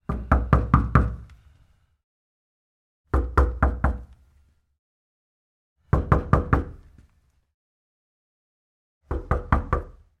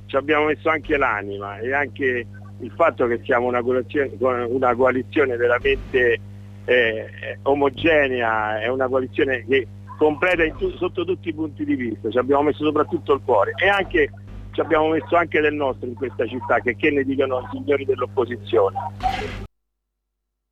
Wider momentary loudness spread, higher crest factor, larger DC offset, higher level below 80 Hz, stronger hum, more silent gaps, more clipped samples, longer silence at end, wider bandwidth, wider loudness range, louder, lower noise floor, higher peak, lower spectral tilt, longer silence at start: first, 12 LU vs 9 LU; first, 24 dB vs 14 dB; neither; first, -30 dBFS vs -44 dBFS; second, none vs 50 Hz at -40 dBFS; first, 2.04-3.04 s, 4.79-5.76 s, 7.54-9.01 s vs none; neither; second, 0.3 s vs 1.05 s; second, 5.8 kHz vs 8.6 kHz; first, 6 LU vs 2 LU; second, -24 LUFS vs -21 LUFS; second, -63 dBFS vs -78 dBFS; first, -2 dBFS vs -6 dBFS; first, -9.5 dB/octave vs -7 dB/octave; about the same, 0.1 s vs 0 s